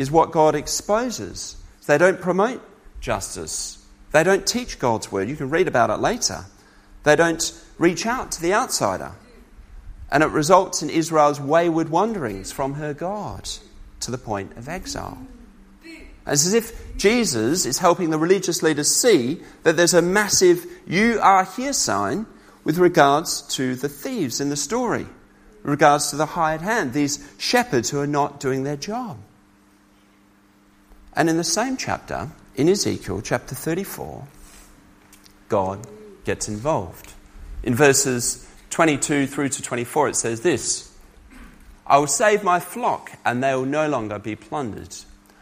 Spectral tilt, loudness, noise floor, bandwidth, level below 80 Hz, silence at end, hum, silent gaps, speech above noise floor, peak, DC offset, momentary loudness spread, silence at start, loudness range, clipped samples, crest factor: -3.5 dB/octave; -21 LUFS; -55 dBFS; 15.5 kHz; -46 dBFS; 0.4 s; none; none; 34 dB; 0 dBFS; under 0.1%; 15 LU; 0 s; 9 LU; under 0.1%; 22 dB